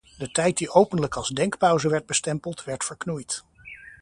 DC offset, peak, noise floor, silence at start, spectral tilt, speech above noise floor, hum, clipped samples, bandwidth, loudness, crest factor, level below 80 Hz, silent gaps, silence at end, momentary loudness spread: under 0.1%; -2 dBFS; -45 dBFS; 0.2 s; -4 dB/octave; 21 dB; none; under 0.1%; 11.5 kHz; -24 LUFS; 24 dB; -56 dBFS; none; 0.1 s; 12 LU